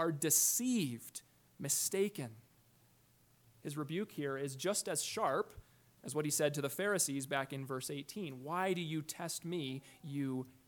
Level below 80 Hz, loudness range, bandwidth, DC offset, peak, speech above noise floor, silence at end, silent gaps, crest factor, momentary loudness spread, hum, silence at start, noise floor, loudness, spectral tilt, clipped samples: -76 dBFS; 4 LU; 19 kHz; under 0.1%; -18 dBFS; 32 dB; 0.15 s; none; 20 dB; 14 LU; none; 0 s; -69 dBFS; -37 LUFS; -3.5 dB/octave; under 0.1%